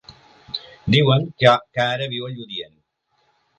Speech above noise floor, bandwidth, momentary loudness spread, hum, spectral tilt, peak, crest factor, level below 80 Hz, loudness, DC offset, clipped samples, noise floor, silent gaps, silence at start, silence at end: 48 dB; 8.8 kHz; 16 LU; none; -6.5 dB/octave; 0 dBFS; 22 dB; -52 dBFS; -19 LUFS; under 0.1%; under 0.1%; -67 dBFS; none; 0.1 s; 0.95 s